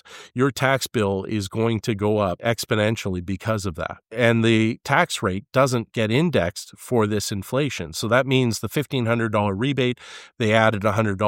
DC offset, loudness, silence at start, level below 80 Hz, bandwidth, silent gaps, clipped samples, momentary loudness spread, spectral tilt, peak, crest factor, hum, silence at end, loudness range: under 0.1%; -22 LUFS; 0.05 s; -54 dBFS; 16.5 kHz; none; under 0.1%; 8 LU; -5.5 dB/octave; -2 dBFS; 20 dB; none; 0 s; 2 LU